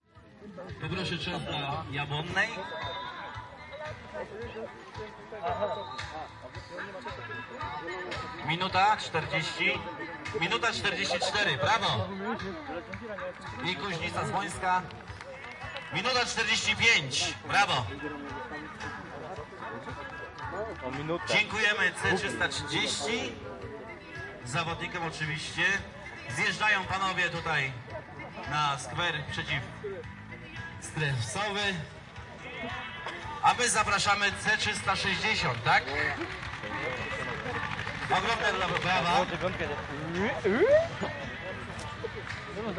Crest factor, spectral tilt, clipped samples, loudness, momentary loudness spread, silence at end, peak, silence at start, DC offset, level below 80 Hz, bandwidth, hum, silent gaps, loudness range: 22 dB; -3.5 dB/octave; under 0.1%; -30 LUFS; 16 LU; 0 s; -10 dBFS; 0.15 s; under 0.1%; -56 dBFS; 11.5 kHz; none; none; 9 LU